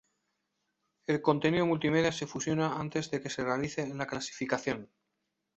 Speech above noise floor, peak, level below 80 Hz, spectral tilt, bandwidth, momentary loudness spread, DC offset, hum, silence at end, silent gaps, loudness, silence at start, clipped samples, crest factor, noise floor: 52 dB; -12 dBFS; -64 dBFS; -5 dB/octave; 8.2 kHz; 8 LU; under 0.1%; none; 0.75 s; none; -32 LUFS; 1.1 s; under 0.1%; 20 dB; -83 dBFS